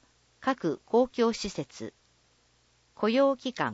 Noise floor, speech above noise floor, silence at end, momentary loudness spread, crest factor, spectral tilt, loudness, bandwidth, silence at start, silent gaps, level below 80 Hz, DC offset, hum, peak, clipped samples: -67 dBFS; 39 dB; 0 s; 15 LU; 18 dB; -5 dB/octave; -28 LUFS; 8 kHz; 0.45 s; none; -62 dBFS; under 0.1%; none; -12 dBFS; under 0.1%